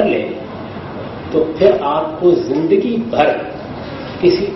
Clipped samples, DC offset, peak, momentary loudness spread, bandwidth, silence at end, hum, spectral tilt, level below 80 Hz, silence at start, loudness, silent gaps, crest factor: under 0.1%; under 0.1%; 0 dBFS; 14 LU; 6 kHz; 0 s; none; -7.5 dB/octave; -46 dBFS; 0 s; -15 LUFS; none; 16 dB